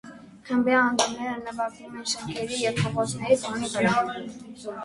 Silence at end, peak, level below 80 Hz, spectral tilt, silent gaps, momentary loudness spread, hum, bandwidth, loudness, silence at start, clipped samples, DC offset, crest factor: 0 s; -8 dBFS; -60 dBFS; -4 dB/octave; none; 16 LU; none; 11.5 kHz; -26 LUFS; 0.05 s; under 0.1%; under 0.1%; 20 dB